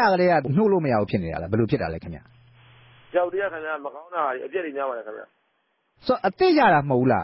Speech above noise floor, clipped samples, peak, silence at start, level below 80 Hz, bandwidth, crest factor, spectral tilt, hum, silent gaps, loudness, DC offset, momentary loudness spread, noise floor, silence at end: 48 dB; under 0.1%; -8 dBFS; 0 s; -50 dBFS; 5.8 kHz; 16 dB; -11 dB/octave; none; none; -23 LUFS; under 0.1%; 15 LU; -71 dBFS; 0 s